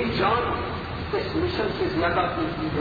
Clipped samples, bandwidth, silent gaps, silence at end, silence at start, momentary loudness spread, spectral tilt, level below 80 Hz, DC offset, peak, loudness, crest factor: under 0.1%; 7 kHz; none; 0 s; 0 s; 6 LU; -8 dB/octave; -40 dBFS; under 0.1%; -10 dBFS; -25 LUFS; 16 dB